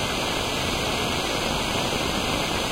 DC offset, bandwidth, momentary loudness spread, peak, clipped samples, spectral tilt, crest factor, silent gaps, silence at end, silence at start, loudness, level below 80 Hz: under 0.1%; 16 kHz; 0 LU; -8 dBFS; under 0.1%; -3 dB/octave; 16 dB; none; 0 s; 0 s; -24 LUFS; -38 dBFS